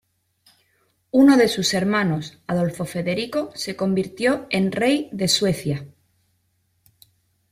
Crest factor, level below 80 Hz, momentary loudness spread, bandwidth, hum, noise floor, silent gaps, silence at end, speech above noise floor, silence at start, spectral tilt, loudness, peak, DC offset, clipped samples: 18 dB; -58 dBFS; 11 LU; 15.5 kHz; none; -68 dBFS; none; 1.65 s; 48 dB; 1.15 s; -5 dB/octave; -21 LUFS; -4 dBFS; under 0.1%; under 0.1%